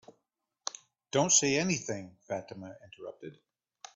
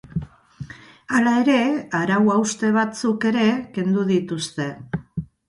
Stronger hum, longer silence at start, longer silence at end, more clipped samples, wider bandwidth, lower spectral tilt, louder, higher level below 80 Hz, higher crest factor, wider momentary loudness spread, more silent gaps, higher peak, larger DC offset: neither; first, 0.65 s vs 0.15 s; first, 0.65 s vs 0.25 s; neither; second, 8.4 kHz vs 11.5 kHz; second, -2.5 dB/octave vs -5.5 dB/octave; second, -30 LUFS vs -21 LUFS; second, -72 dBFS vs -52 dBFS; first, 22 dB vs 16 dB; first, 24 LU vs 14 LU; neither; second, -12 dBFS vs -6 dBFS; neither